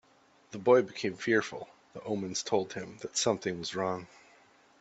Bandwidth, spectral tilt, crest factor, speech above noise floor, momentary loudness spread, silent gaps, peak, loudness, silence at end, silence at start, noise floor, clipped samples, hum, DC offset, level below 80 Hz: 8.4 kHz; -3.5 dB/octave; 22 dB; 33 dB; 17 LU; none; -10 dBFS; -31 LUFS; 0.75 s; 0.5 s; -64 dBFS; under 0.1%; none; under 0.1%; -72 dBFS